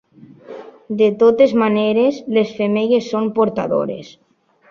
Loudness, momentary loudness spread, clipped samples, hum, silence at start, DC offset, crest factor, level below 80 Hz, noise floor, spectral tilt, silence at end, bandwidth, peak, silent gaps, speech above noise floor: -16 LUFS; 20 LU; under 0.1%; none; 0.5 s; under 0.1%; 16 dB; -60 dBFS; -40 dBFS; -7 dB/octave; 0.65 s; 7 kHz; -2 dBFS; none; 24 dB